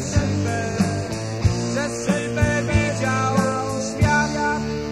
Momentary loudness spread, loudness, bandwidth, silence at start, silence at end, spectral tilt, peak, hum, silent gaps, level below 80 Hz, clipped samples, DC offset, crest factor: 5 LU; -22 LUFS; 14 kHz; 0 s; 0 s; -5.5 dB/octave; -4 dBFS; none; none; -34 dBFS; under 0.1%; 0.2%; 16 dB